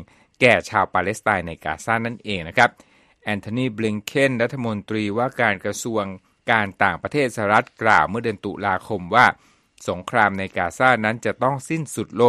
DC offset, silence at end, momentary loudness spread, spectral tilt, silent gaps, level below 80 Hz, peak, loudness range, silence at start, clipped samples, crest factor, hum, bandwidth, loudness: under 0.1%; 0 s; 11 LU; -5 dB/octave; none; -54 dBFS; 0 dBFS; 3 LU; 0 s; under 0.1%; 20 dB; none; 13.5 kHz; -21 LUFS